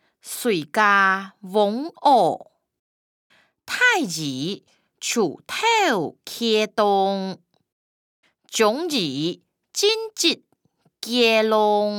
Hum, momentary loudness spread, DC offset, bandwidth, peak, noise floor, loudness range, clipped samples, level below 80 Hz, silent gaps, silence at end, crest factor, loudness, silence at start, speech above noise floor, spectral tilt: none; 13 LU; under 0.1%; 19.5 kHz; -4 dBFS; -65 dBFS; 3 LU; under 0.1%; -78 dBFS; 2.79-3.30 s, 7.72-8.23 s; 0 s; 18 dB; -21 LUFS; 0.25 s; 44 dB; -3 dB/octave